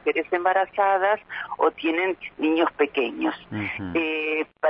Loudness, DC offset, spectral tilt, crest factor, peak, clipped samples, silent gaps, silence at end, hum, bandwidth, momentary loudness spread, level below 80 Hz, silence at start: -24 LUFS; under 0.1%; -8.5 dB/octave; 16 dB; -8 dBFS; under 0.1%; none; 0 s; none; 5.4 kHz; 7 LU; -62 dBFS; 0.05 s